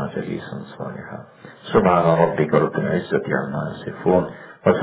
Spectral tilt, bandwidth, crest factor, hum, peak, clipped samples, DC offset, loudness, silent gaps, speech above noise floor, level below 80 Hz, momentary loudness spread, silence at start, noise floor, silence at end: -11.5 dB/octave; 4 kHz; 20 dB; none; -2 dBFS; under 0.1%; under 0.1%; -20 LUFS; none; 21 dB; -50 dBFS; 17 LU; 0 s; -41 dBFS; 0 s